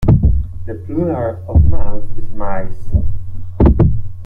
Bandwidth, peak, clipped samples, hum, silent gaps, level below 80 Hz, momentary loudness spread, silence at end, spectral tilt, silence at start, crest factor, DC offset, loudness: 2.7 kHz; 0 dBFS; under 0.1%; none; none; -18 dBFS; 16 LU; 0 s; -11.5 dB/octave; 0 s; 10 dB; under 0.1%; -17 LUFS